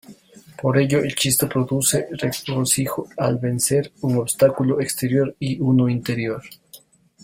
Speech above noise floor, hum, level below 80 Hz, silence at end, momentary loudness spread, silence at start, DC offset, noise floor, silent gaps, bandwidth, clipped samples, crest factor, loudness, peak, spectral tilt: 29 dB; none; -54 dBFS; 0.45 s; 7 LU; 0.1 s; under 0.1%; -49 dBFS; none; 16.5 kHz; under 0.1%; 18 dB; -20 LUFS; -2 dBFS; -4.5 dB/octave